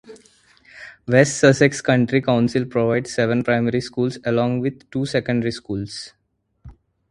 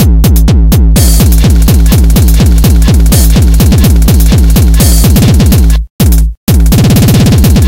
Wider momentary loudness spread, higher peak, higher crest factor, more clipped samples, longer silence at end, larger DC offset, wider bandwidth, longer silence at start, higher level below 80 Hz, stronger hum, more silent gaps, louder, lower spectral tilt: first, 15 LU vs 3 LU; about the same, 0 dBFS vs 0 dBFS; first, 20 dB vs 4 dB; second, under 0.1% vs 1%; first, 0.4 s vs 0 s; second, under 0.1% vs 2%; second, 11.5 kHz vs 17.5 kHz; about the same, 0.1 s vs 0 s; second, -52 dBFS vs -6 dBFS; neither; second, none vs 5.90-5.99 s, 6.37-6.47 s; second, -19 LUFS vs -6 LUFS; about the same, -5.5 dB/octave vs -5.5 dB/octave